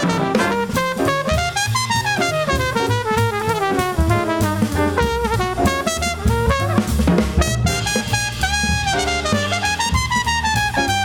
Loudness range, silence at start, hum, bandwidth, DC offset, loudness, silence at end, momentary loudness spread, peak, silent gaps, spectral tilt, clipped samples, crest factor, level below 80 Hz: 0 LU; 0 s; none; over 20 kHz; under 0.1%; -18 LUFS; 0 s; 2 LU; -2 dBFS; none; -4.5 dB/octave; under 0.1%; 16 dB; -28 dBFS